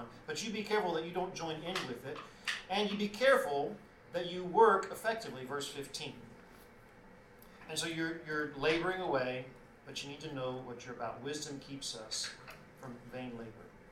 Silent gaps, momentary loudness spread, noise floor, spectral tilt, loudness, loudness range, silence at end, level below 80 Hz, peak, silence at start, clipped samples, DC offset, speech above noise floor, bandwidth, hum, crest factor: none; 21 LU; -58 dBFS; -3.5 dB/octave; -36 LUFS; 10 LU; 0 s; -66 dBFS; -14 dBFS; 0 s; under 0.1%; under 0.1%; 22 dB; 16.5 kHz; none; 24 dB